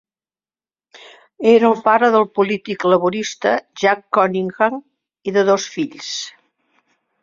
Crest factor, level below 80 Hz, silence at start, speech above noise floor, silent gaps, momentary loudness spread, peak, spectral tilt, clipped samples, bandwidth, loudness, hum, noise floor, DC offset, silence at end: 16 dB; -66 dBFS; 0.95 s; over 74 dB; none; 13 LU; -2 dBFS; -4.5 dB/octave; under 0.1%; 7.6 kHz; -17 LUFS; none; under -90 dBFS; under 0.1%; 0.9 s